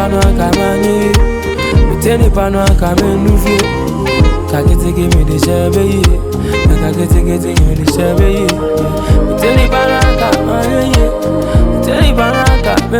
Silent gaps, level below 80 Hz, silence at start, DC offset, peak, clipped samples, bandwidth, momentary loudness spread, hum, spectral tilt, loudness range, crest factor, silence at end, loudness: none; -14 dBFS; 0 s; under 0.1%; 0 dBFS; under 0.1%; 18 kHz; 3 LU; none; -6 dB/octave; 1 LU; 10 dB; 0 s; -11 LUFS